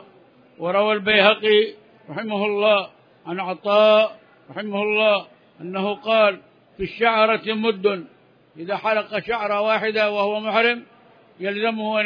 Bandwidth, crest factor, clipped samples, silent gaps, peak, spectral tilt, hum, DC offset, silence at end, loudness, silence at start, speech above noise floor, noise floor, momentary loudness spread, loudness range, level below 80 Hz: 5.2 kHz; 20 dB; under 0.1%; none; -2 dBFS; -6.5 dB/octave; none; under 0.1%; 0 s; -20 LUFS; 0.6 s; 32 dB; -52 dBFS; 16 LU; 3 LU; -60 dBFS